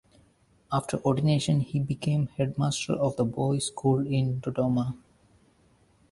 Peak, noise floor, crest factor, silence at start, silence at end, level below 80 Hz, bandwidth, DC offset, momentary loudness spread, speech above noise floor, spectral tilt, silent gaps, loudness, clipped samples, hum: -10 dBFS; -63 dBFS; 18 dB; 0.7 s; 1.15 s; -56 dBFS; 11.5 kHz; under 0.1%; 5 LU; 37 dB; -6.5 dB/octave; none; -27 LUFS; under 0.1%; none